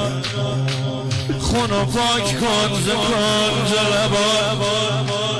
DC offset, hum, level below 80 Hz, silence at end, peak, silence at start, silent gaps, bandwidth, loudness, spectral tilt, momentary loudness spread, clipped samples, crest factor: under 0.1%; none; -38 dBFS; 0 s; -10 dBFS; 0 s; none; 11 kHz; -18 LUFS; -4 dB/octave; 6 LU; under 0.1%; 8 dB